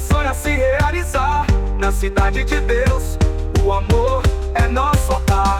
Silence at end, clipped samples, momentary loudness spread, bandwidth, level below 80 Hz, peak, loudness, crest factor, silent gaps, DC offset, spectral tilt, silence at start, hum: 0 s; under 0.1%; 3 LU; 16 kHz; -18 dBFS; -6 dBFS; -18 LUFS; 10 dB; none; under 0.1%; -6 dB/octave; 0 s; none